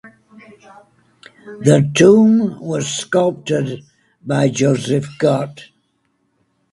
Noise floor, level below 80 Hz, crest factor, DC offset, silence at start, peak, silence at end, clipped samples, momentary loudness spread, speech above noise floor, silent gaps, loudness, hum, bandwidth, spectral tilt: -65 dBFS; -56 dBFS; 18 dB; under 0.1%; 0.05 s; 0 dBFS; 1.1 s; under 0.1%; 15 LU; 50 dB; none; -15 LUFS; none; 11.5 kHz; -6 dB/octave